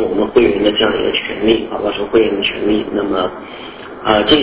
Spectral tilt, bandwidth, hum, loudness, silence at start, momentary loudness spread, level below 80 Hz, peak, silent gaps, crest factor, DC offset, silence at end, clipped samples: -9 dB/octave; 4 kHz; none; -15 LUFS; 0 s; 10 LU; -40 dBFS; 0 dBFS; none; 14 dB; under 0.1%; 0 s; under 0.1%